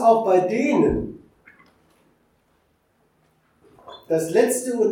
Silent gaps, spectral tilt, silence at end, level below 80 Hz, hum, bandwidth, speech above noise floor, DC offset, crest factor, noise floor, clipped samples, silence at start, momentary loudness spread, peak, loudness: none; -5.5 dB/octave; 0 s; -48 dBFS; none; 17 kHz; 46 dB; under 0.1%; 20 dB; -65 dBFS; under 0.1%; 0 s; 18 LU; -4 dBFS; -20 LUFS